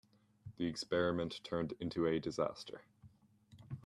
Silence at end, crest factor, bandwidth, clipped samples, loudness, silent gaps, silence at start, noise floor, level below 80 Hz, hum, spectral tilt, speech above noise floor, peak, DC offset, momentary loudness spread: 0.05 s; 18 dB; 12 kHz; under 0.1%; -38 LUFS; none; 0.45 s; -65 dBFS; -70 dBFS; none; -6 dB/octave; 27 dB; -22 dBFS; under 0.1%; 17 LU